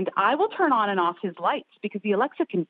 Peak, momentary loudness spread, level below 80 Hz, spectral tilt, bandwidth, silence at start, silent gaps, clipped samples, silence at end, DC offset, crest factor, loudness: -8 dBFS; 8 LU; -80 dBFS; -3.5 dB/octave; 4.9 kHz; 0 s; none; under 0.1%; 0.05 s; under 0.1%; 16 dB; -25 LUFS